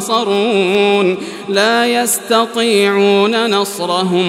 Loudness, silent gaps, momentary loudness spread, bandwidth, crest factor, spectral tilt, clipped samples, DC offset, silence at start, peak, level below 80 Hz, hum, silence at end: -13 LUFS; none; 5 LU; 16 kHz; 12 dB; -3.5 dB/octave; under 0.1%; under 0.1%; 0 s; 0 dBFS; -64 dBFS; none; 0 s